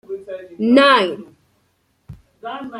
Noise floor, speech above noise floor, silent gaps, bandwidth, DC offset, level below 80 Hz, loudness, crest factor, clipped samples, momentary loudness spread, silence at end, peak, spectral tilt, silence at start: -64 dBFS; 49 dB; none; 11.5 kHz; under 0.1%; -58 dBFS; -14 LUFS; 18 dB; under 0.1%; 22 LU; 0 s; -2 dBFS; -5 dB/octave; 0.1 s